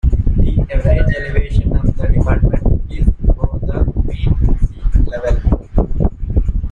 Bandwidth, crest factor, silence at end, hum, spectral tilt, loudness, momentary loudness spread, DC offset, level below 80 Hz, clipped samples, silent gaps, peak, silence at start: 4.3 kHz; 12 dB; 0 s; none; -9.5 dB/octave; -17 LUFS; 4 LU; under 0.1%; -14 dBFS; under 0.1%; none; 0 dBFS; 0.05 s